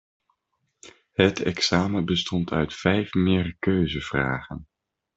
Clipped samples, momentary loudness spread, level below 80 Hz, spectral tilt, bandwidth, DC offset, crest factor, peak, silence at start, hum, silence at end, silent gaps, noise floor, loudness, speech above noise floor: under 0.1%; 7 LU; -50 dBFS; -5.5 dB/octave; 7.8 kHz; under 0.1%; 22 dB; -4 dBFS; 0.85 s; none; 0.5 s; none; -76 dBFS; -24 LUFS; 52 dB